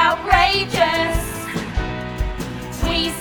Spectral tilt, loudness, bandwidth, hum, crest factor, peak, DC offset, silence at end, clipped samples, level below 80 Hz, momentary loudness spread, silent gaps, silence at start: -4 dB/octave; -20 LUFS; over 20 kHz; none; 20 dB; 0 dBFS; under 0.1%; 0 s; under 0.1%; -28 dBFS; 12 LU; none; 0 s